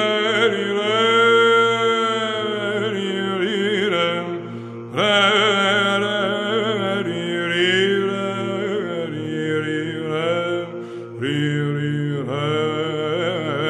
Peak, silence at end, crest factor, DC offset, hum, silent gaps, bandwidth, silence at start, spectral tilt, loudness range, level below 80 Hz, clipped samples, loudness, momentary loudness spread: -2 dBFS; 0 s; 18 dB; under 0.1%; none; none; 11 kHz; 0 s; -5 dB/octave; 5 LU; -72 dBFS; under 0.1%; -20 LUFS; 11 LU